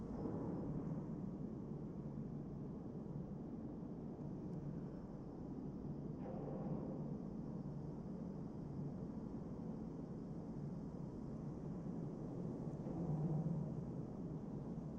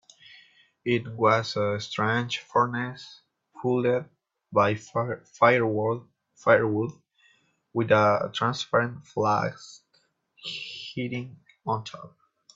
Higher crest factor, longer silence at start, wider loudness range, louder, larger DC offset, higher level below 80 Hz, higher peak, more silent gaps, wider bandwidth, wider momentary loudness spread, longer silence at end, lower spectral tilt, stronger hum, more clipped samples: second, 14 dB vs 22 dB; second, 0 s vs 0.85 s; about the same, 4 LU vs 5 LU; second, -47 LUFS vs -26 LUFS; neither; first, -62 dBFS vs -68 dBFS; second, -32 dBFS vs -6 dBFS; neither; about the same, 7.4 kHz vs 7.8 kHz; second, 5 LU vs 15 LU; second, 0 s vs 0.5 s; first, -10.5 dB/octave vs -6 dB/octave; neither; neither